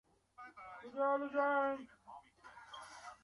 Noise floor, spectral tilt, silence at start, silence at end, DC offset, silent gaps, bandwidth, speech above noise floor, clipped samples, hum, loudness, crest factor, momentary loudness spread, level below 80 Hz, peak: -60 dBFS; -4 dB/octave; 0.4 s; 0.1 s; under 0.1%; none; 11.5 kHz; 24 dB; under 0.1%; none; -37 LUFS; 18 dB; 23 LU; -80 dBFS; -24 dBFS